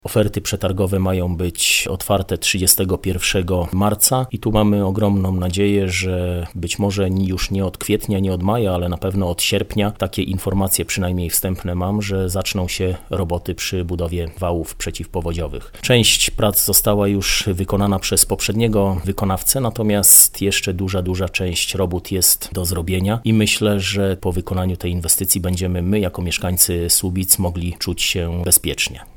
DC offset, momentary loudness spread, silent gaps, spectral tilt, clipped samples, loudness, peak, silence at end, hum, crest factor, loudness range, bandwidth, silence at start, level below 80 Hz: under 0.1%; 9 LU; none; -3.5 dB/octave; under 0.1%; -17 LUFS; 0 dBFS; 0.05 s; none; 18 dB; 6 LU; over 20 kHz; 0.05 s; -36 dBFS